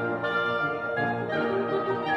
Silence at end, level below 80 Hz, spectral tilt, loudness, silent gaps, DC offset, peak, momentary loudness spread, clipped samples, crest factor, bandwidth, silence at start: 0 s; -64 dBFS; -7 dB/octave; -27 LUFS; none; under 0.1%; -14 dBFS; 2 LU; under 0.1%; 14 dB; 8.2 kHz; 0 s